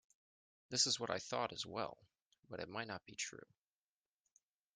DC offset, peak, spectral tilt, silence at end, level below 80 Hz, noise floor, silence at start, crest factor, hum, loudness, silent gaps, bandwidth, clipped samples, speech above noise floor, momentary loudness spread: under 0.1%; -20 dBFS; -1.5 dB/octave; 1.3 s; -82 dBFS; under -90 dBFS; 0.7 s; 26 dB; none; -41 LUFS; 2.26-2.30 s, 2.39-2.43 s; 11.5 kHz; under 0.1%; over 47 dB; 14 LU